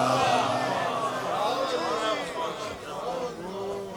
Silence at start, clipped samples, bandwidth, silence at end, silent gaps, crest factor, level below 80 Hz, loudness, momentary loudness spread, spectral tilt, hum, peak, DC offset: 0 s; under 0.1%; 19 kHz; 0 s; none; 16 dB; -62 dBFS; -28 LUFS; 11 LU; -4 dB/octave; none; -12 dBFS; under 0.1%